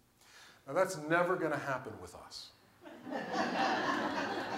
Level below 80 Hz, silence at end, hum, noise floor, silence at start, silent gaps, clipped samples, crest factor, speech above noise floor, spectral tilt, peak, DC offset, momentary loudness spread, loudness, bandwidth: -76 dBFS; 0 s; none; -60 dBFS; 0.35 s; none; under 0.1%; 20 dB; 25 dB; -4.5 dB/octave; -16 dBFS; under 0.1%; 18 LU; -34 LUFS; 16 kHz